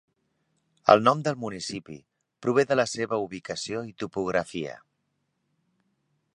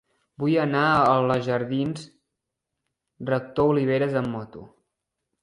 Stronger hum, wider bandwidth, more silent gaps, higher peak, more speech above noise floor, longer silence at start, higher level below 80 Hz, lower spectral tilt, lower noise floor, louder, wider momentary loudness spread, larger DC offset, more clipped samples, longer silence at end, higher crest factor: neither; about the same, 11 kHz vs 11 kHz; neither; first, -2 dBFS vs -6 dBFS; second, 50 dB vs 60 dB; first, 0.85 s vs 0.4 s; second, -66 dBFS vs -58 dBFS; second, -5 dB/octave vs -7.5 dB/octave; second, -76 dBFS vs -83 dBFS; second, -26 LUFS vs -23 LUFS; about the same, 16 LU vs 15 LU; neither; neither; first, 1.6 s vs 0.75 s; first, 26 dB vs 20 dB